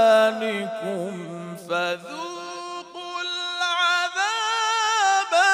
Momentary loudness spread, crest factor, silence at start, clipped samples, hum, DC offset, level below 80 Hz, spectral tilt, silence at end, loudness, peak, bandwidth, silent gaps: 15 LU; 16 dB; 0 s; under 0.1%; 50 Hz at -75 dBFS; under 0.1%; -78 dBFS; -2 dB/octave; 0 s; -23 LUFS; -6 dBFS; 15 kHz; none